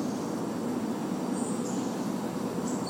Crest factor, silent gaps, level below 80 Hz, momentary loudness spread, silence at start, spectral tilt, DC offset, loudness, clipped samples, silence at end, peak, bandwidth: 12 dB; none; -68 dBFS; 2 LU; 0 s; -5.5 dB/octave; under 0.1%; -32 LUFS; under 0.1%; 0 s; -18 dBFS; 16 kHz